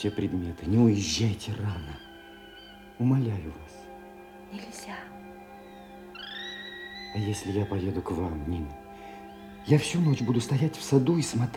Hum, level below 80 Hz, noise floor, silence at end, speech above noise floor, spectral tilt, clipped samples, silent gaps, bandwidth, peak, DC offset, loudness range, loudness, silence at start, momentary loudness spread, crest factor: none; -52 dBFS; -48 dBFS; 0 s; 21 dB; -6 dB/octave; under 0.1%; none; 16.5 kHz; -8 dBFS; under 0.1%; 12 LU; -28 LUFS; 0 s; 23 LU; 20 dB